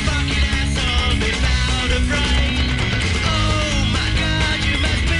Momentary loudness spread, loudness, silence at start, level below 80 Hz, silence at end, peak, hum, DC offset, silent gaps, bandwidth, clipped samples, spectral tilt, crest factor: 1 LU; -18 LUFS; 0 s; -22 dBFS; 0 s; -6 dBFS; none; under 0.1%; none; 11.5 kHz; under 0.1%; -4 dB/octave; 12 dB